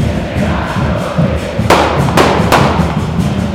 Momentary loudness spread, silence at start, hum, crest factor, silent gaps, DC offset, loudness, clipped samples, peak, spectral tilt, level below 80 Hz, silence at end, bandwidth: 6 LU; 0 s; none; 12 dB; none; under 0.1%; -12 LUFS; 0.4%; 0 dBFS; -6 dB/octave; -24 dBFS; 0 s; 17 kHz